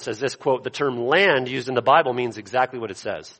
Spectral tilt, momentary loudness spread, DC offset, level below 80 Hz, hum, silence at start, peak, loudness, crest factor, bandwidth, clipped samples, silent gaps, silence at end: -4.5 dB/octave; 10 LU; under 0.1%; -66 dBFS; none; 0 s; -4 dBFS; -21 LUFS; 18 dB; 8.8 kHz; under 0.1%; none; 0.1 s